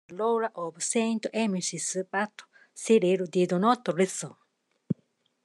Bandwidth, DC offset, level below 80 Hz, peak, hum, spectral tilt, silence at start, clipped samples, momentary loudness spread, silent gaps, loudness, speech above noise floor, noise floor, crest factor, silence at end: 12.5 kHz; under 0.1%; -82 dBFS; -10 dBFS; none; -4.5 dB/octave; 0.1 s; under 0.1%; 12 LU; none; -28 LUFS; 43 dB; -70 dBFS; 18 dB; 0.5 s